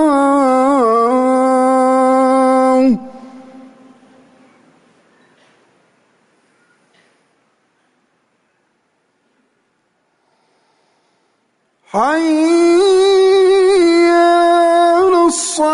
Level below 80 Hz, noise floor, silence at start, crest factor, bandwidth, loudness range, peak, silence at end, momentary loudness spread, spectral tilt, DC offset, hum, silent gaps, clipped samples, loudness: -56 dBFS; -63 dBFS; 0 s; 10 dB; 11 kHz; 11 LU; -4 dBFS; 0 s; 4 LU; -3.5 dB/octave; under 0.1%; none; none; under 0.1%; -11 LUFS